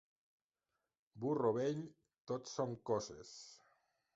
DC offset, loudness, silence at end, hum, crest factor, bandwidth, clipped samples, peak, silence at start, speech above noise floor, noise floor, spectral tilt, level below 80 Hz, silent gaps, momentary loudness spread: under 0.1%; -41 LUFS; 0.6 s; none; 20 dB; 8 kHz; under 0.1%; -22 dBFS; 1.15 s; over 50 dB; under -90 dBFS; -6.5 dB/octave; -78 dBFS; 2.20-2.25 s; 18 LU